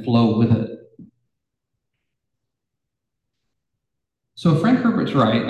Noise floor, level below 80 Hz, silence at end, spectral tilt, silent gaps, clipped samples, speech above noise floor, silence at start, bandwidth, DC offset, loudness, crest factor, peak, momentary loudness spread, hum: -82 dBFS; -52 dBFS; 0 s; -8.5 dB/octave; none; under 0.1%; 65 dB; 0 s; 9.2 kHz; under 0.1%; -18 LUFS; 16 dB; -6 dBFS; 6 LU; none